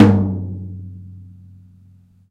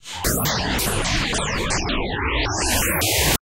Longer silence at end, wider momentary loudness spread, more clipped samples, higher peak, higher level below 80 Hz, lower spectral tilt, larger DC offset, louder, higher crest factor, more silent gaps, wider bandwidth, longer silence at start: first, 1.05 s vs 0.1 s; first, 24 LU vs 5 LU; neither; first, 0 dBFS vs -6 dBFS; second, -50 dBFS vs -30 dBFS; first, -9.5 dB/octave vs -3 dB/octave; second, under 0.1% vs 0.3%; about the same, -20 LUFS vs -21 LUFS; about the same, 20 dB vs 16 dB; neither; second, 7 kHz vs 17 kHz; about the same, 0 s vs 0.05 s